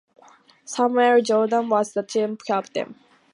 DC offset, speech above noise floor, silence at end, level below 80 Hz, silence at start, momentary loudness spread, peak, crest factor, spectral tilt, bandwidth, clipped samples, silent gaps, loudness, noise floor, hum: under 0.1%; 32 dB; 0.4 s; -78 dBFS; 0.7 s; 13 LU; -6 dBFS; 16 dB; -4 dB/octave; 11.5 kHz; under 0.1%; none; -22 LUFS; -53 dBFS; none